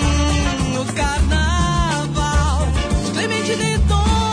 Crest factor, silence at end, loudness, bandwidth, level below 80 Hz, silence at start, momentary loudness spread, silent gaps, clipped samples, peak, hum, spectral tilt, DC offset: 12 dB; 0 s; -18 LUFS; 10.5 kHz; -20 dBFS; 0 s; 3 LU; none; under 0.1%; -6 dBFS; none; -5 dB/octave; under 0.1%